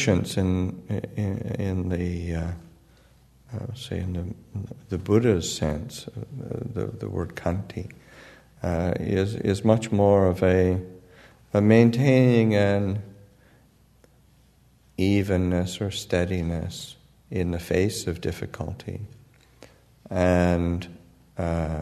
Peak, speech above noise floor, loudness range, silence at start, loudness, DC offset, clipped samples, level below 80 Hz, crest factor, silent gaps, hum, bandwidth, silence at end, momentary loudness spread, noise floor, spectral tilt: -4 dBFS; 34 dB; 10 LU; 0 s; -25 LUFS; under 0.1%; under 0.1%; -46 dBFS; 22 dB; none; none; 13.5 kHz; 0 s; 18 LU; -58 dBFS; -6.5 dB/octave